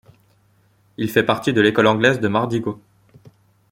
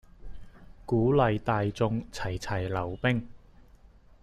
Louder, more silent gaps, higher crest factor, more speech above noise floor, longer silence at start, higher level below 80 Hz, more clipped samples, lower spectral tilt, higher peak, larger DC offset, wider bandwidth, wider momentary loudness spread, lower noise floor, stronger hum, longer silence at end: first, -18 LUFS vs -29 LUFS; neither; about the same, 20 dB vs 20 dB; first, 41 dB vs 27 dB; first, 1 s vs 0.2 s; second, -58 dBFS vs -48 dBFS; neither; about the same, -6 dB/octave vs -7 dB/octave; first, -2 dBFS vs -10 dBFS; neither; first, 16.5 kHz vs 12.5 kHz; about the same, 12 LU vs 10 LU; about the same, -58 dBFS vs -55 dBFS; neither; about the same, 0.95 s vs 0.85 s